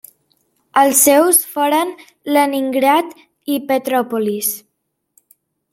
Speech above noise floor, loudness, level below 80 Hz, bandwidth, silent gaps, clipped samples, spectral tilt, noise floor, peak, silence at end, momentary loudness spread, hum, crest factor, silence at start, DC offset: 48 dB; -15 LUFS; -68 dBFS; 16.5 kHz; none; under 0.1%; -2 dB/octave; -63 dBFS; 0 dBFS; 1.15 s; 14 LU; none; 18 dB; 0.75 s; under 0.1%